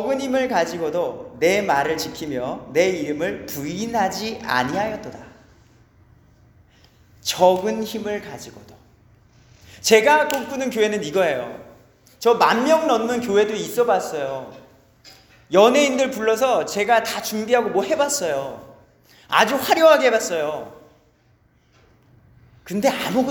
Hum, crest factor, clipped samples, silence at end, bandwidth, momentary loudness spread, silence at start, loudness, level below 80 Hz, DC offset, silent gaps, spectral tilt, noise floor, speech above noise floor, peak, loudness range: none; 20 dB; under 0.1%; 0 s; over 20 kHz; 13 LU; 0 s; -20 LUFS; -58 dBFS; under 0.1%; none; -3.5 dB/octave; -59 dBFS; 39 dB; 0 dBFS; 6 LU